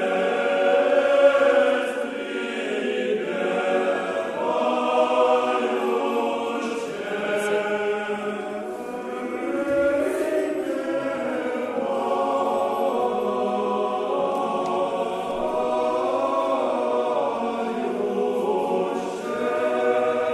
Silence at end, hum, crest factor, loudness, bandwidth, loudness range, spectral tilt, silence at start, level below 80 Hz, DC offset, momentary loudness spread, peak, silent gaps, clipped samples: 0 s; none; 18 dB; -23 LUFS; 13 kHz; 4 LU; -4.5 dB/octave; 0 s; -62 dBFS; under 0.1%; 8 LU; -6 dBFS; none; under 0.1%